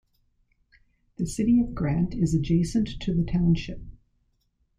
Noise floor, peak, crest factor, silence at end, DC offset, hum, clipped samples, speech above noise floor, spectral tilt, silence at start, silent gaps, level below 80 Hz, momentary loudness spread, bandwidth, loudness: -70 dBFS; -12 dBFS; 14 dB; 0.9 s; under 0.1%; none; under 0.1%; 46 dB; -7 dB/octave; 1.2 s; none; -40 dBFS; 10 LU; 10.5 kHz; -25 LUFS